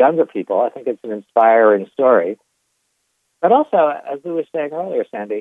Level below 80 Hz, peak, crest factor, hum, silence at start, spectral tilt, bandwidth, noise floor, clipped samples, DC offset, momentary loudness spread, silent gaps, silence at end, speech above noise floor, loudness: -78 dBFS; -2 dBFS; 14 dB; none; 0 s; -8 dB/octave; 3.8 kHz; -69 dBFS; under 0.1%; under 0.1%; 12 LU; none; 0 s; 53 dB; -17 LUFS